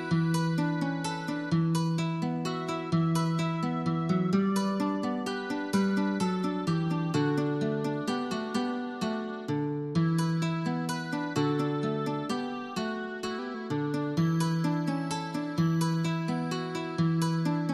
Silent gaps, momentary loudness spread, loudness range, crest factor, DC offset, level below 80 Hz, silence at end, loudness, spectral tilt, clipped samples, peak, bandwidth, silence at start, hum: none; 6 LU; 2 LU; 14 dB; under 0.1%; -68 dBFS; 0 s; -30 LUFS; -6.5 dB/octave; under 0.1%; -14 dBFS; 12.5 kHz; 0 s; none